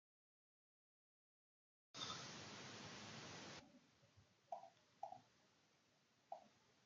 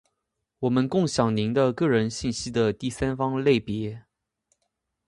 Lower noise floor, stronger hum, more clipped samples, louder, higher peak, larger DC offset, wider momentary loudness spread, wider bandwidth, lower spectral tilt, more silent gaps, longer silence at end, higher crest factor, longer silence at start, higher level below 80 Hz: about the same, -79 dBFS vs -81 dBFS; neither; neither; second, -56 LUFS vs -25 LUFS; second, -36 dBFS vs -6 dBFS; neither; about the same, 10 LU vs 8 LU; second, 8.8 kHz vs 11.5 kHz; second, -2.5 dB/octave vs -6 dB/octave; neither; second, 0 s vs 1.05 s; about the same, 24 dB vs 20 dB; first, 1.95 s vs 0.6 s; second, under -90 dBFS vs -52 dBFS